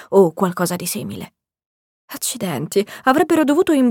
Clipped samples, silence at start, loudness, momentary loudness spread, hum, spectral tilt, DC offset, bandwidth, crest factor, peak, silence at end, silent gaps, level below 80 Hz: under 0.1%; 0 s; -18 LUFS; 16 LU; none; -5 dB/octave; under 0.1%; 18.5 kHz; 18 dB; -2 dBFS; 0 s; 1.66-2.08 s; -60 dBFS